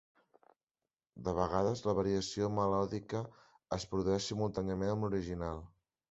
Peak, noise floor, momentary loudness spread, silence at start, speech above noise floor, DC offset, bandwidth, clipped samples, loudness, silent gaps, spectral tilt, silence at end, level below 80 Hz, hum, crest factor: -16 dBFS; under -90 dBFS; 9 LU; 1.15 s; over 55 dB; under 0.1%; 8 kHz; under 0.1%; -36 LUFS; none; -6 dB/octave; 0.45 s; -56 dBFS; none; 20 dB